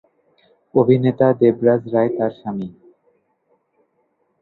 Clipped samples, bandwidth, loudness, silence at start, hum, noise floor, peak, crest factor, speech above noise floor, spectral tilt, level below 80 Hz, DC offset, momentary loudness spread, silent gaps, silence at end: under 0.1%; 4.2 kHz; -18 LUFS; 0.75 s; none; -66 dBFS; 0 dBFS; 18 dB; 50 dB; -11.5 dB/octave; -60 dBFS; under 0.1%; 13 LU; none; 1.7 s